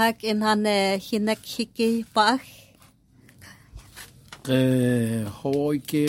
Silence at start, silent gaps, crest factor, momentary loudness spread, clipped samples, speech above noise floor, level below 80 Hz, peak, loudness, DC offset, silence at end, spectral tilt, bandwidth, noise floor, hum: 0 s; none; 20 dB; 15 LU; under 0.1%; 33 dB; -58 dBFS; -6 dBFS; -24 LUFS; under 0.1%; 0 s; -5.5 dB/octave; 16.5 kHz; -56 dBFS; none